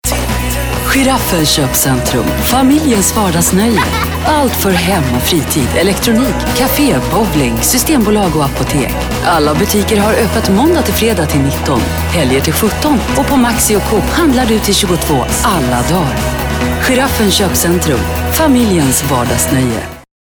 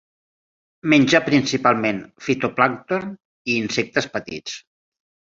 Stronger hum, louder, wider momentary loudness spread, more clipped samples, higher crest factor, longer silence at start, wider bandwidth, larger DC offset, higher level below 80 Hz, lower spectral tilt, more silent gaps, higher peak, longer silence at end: neither; first, -11 LUFS vs -20 LUFS; second, 4 LU vs 15 LU; neither; second, 10 dB vs 20 dB; second, 0.05 s vs 0.85 s; first, over 20 kHz vs 7.8 kHz; neither; first, -24 dBFS vs -60 dBFS; about the same, -4 dB/octave vs -4.5 dB/octave; second, none vs 3.25-3.45 s; about the same, 0 dBFS vs -2 dBFS; second, 0.2 s vs 0.7 s